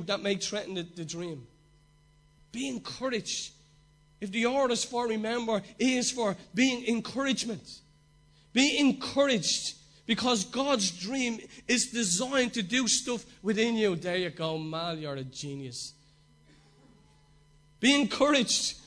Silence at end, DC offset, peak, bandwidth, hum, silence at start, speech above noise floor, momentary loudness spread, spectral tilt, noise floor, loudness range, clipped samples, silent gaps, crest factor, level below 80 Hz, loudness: 0.05 s; under 0.1%; -10 dBFS; 11 kHz; none; 0 s; 33 dB; 14 LU; -3 dB/octave; -62 dBFS; 9 LU; under 0.1%; none; 22 dB; -64 dBFS; -29 LUFS